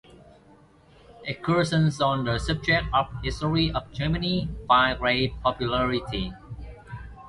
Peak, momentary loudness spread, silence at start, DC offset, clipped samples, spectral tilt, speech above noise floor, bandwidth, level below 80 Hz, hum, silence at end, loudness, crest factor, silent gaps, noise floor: -6 dBFS; 17 LU; 0.1 s; under 0.1%; under 0.1%; -6 dB/octave; 30 dB; 11.5 kHz; -40 dBFS; none; 0 s; -25 LUFS; 20 dB; none; -55 dBFS